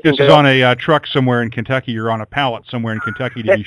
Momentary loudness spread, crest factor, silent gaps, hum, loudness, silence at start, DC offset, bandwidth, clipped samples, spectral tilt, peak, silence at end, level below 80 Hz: 12 LU; 14 dB; none; none; -15 LUFS; 0.05 s; under 0.1%; 11 kHz; 0.2%; -7 dB/octave; 0 dBFS; 0 s; -50 dBFS